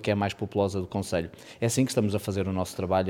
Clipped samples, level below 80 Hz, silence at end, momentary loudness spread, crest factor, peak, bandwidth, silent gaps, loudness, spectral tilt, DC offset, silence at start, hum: under 0.1%; -56 dBFS; 0 s; 6 LU; 16 dB; -10 dBFS; 17.5 kHz; none; -28 LUFS; -5.5 dB/octave; under 0.1%; 0 s; none